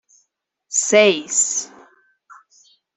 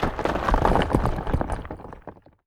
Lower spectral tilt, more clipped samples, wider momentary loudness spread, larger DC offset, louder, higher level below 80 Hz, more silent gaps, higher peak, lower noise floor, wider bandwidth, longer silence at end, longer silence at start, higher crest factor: second, -1 dB/octave vs -7 dB/octave; neither; second, 11 LU vs 20 LU; neither; first, -16 LUFS vs -24 LUFS; second, -74 dBFS vs -30 dBFS; neither; about the same, -2 dBFS vs -4 dBFS; first, -70 dBFS vs -45 dBFS; second, 8.4 kHz vs 14.5 kHz; first, 1.3 s vs 0.35 s; first, 0.7 s vs 0 s; about the same, 20 dB vs 22 dB